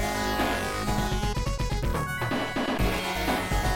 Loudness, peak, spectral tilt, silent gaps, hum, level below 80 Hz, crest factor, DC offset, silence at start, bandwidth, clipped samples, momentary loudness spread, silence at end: -28 LUFS; -14 dBFS; -4.5 dB/octave; none; none; -34 dBFS; 12 dB; under 0.1%; 0 s; 16.5 kHz; under 0.1%; 3 LU; 0 s